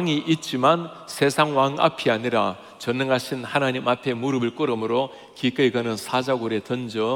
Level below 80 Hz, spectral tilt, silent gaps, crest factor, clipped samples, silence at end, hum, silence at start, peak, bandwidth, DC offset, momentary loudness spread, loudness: -70 dBFS; -5 dB/octave; none; 18 dB; under 0.1%; 0 s; none; 0 s; -4 dBFS; 17.5 kHz; under 0.1%; 7 LU; -23 LUFS